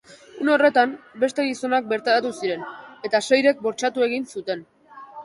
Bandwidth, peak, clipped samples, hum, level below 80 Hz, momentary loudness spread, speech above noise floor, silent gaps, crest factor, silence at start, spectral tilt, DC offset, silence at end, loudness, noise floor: 11.5 kHz; -4 dBFS; under 0.1%; none; -72 dBFS; 13 LU; 20 dB; none; 18 dB; 0.1 s; -3.5 dB/octave; under 0.1%; 0 s; -22 LUFS; -42 dBFS